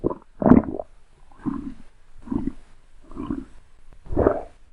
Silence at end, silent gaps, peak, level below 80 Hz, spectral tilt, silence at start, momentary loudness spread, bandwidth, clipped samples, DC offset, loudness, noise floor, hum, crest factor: 0.25 s; none; 0 dBFS; -38 dBFS; -10.5 dB/octave; 0 s; 19 LU; 4.1 kHz; under 0.1%; under 0.1%; -24 LUFS; -46 dBFS; none; 24 dB